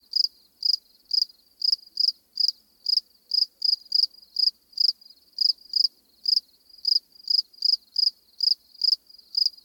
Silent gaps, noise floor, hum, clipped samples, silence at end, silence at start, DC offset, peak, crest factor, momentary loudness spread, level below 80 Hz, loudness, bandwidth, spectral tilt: none; -42 dBFS; none; under 0.1%; 0.15 s; 0.15 s; under 0.1%; -10 dBFS; 16 dB; 5 LU; -80 dBFS; -23 LUFS; 19.5 kHz; 3.5 dB/octave